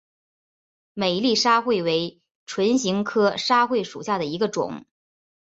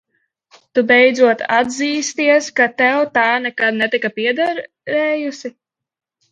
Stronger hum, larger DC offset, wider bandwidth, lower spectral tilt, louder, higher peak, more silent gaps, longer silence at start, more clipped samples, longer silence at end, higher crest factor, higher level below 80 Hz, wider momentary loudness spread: neither; neither; second, 8.2 kHz vs 9.2 kHz; about the same, -4 dB/octave vs -3 dB/octave; second, -22 LUFS vs -15 LUFS; second, -6 dBFS vs 0 dBFS; first, 2.31-2.47 s vs none; first, 0.95 s vs 0.75 s; neither; about the same, 0.75 s vs 0.8 s; about the same, 18 dB vs 16 dB; about the same, -66 dBFS vs -68 dBFS; about the same, 12 LU vs 10 LU